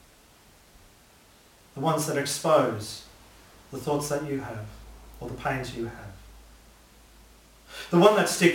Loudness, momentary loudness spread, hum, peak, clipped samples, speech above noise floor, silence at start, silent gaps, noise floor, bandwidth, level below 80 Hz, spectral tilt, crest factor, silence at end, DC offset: -26 LUFS; 24 LU; none; -2 dBFS; under 0.1%; 31 dB; 1.75 s; none; -56 dBFS; 17 kHz; -54 dBFS; -4.5 dB/octave; 26 dB; 0 s; under 0.1%